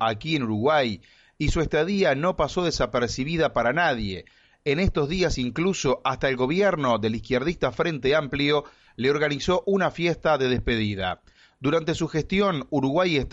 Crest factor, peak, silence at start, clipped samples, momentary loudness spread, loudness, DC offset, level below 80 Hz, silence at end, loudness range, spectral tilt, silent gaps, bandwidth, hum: 14 dB; -10 dBFS; 0 s; under 0.1%; 5 LU; -24 LUFS; under 0.1%; -40 dBFS; 0 s; 1 LU; -5.5 dB/octave; none; 8.2 kHz; none